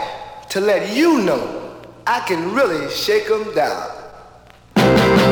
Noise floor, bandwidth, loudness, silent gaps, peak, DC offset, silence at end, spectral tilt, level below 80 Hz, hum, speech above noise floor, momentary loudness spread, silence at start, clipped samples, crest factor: -45 dBFS; over 20 kHz; -17 LUFS; none; -2 dBFS; under 0.1%; 0 s; -5.5 dB/octave; -44 dBFS; none; 27 dB; 16 LU; 0 s; under 0.1%; 16 dB